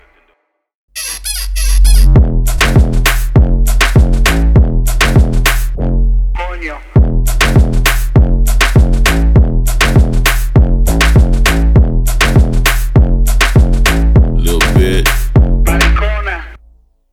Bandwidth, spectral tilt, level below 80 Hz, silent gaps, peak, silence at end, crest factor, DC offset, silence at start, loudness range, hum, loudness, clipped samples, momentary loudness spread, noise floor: 17.5 kHz; -5 dB/octave; -10 dBFS; none; 0 dBFS; 0.55 s; 8 dB; under 0.1%; 0.95 s; 2 LU; none; -11 LUFS; under 0.1%; 7 LU; -59 dBFS